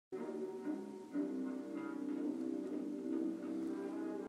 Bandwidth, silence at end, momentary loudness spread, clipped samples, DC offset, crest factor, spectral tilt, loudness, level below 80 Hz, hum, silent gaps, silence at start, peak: 12.5 kHz; 0 s; 4 LU; under 0.1%; under 0.1%; 12 dB; -7 dB/octave; -42 LUFS; under -90 dBFS; none; none; 0.1 s; -30 dBFS